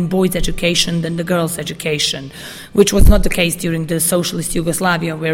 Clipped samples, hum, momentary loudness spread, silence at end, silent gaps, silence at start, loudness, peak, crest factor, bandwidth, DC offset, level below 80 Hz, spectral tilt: 0.2%; none; 7 LU; 0 s; none; 0 s; -16 LUFS; 0 dBFS; 16 dB; 16.5 kHz; under 0.1%; -22 dBFS; -4 dB/octave